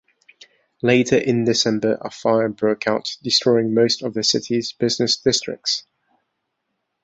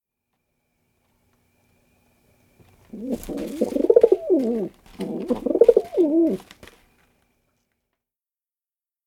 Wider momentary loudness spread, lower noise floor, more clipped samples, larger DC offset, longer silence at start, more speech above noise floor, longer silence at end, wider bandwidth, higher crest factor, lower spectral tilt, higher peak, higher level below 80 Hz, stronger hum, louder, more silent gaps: second, 7 LU vs 16 LU; second, -76 dBFS vs under -90 dBFS; neither; neither; second, 0.85 s vs 2.95 s; second, 56 dB vs over 64 dB; second, 1.25 s vs 2.65 s; second, 8.2 kHz vs 16 kHz; second, 18 dB vs 24 dB; second, -4 dB/octave vs -7.5 dB/octave; about the same, -2 dBFS vs 0 dBFS; about the same, -58 dBFS vs -56 dBFS; neither; about the same, -19 LUFS vs -21 LUFS; neither